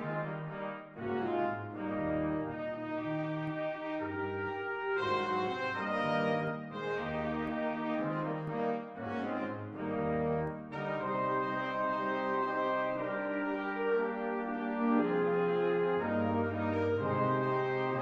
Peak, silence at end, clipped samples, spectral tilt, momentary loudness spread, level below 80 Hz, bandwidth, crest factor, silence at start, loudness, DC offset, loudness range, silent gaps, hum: -18 dBFS; 0 s; under 0.1%; -8 dB/octave; 7 LU; -64 dBFS; 7.8 kHz; 16 dB; 0 s; -34 LUFS; under 0.1%; 4 LU; none; none